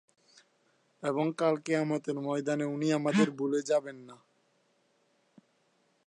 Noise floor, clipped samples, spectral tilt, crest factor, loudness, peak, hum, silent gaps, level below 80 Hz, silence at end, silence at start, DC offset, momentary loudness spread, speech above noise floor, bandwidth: -72 dBFS; under 0.1%; -6 dB/octave; 20 dB; -31 LUFS; -14 dBFS; none; none; -84 dBFS; 1.9 s; 1 s; under 0.1%; 6 LU; 42 dB; 10.5 kHz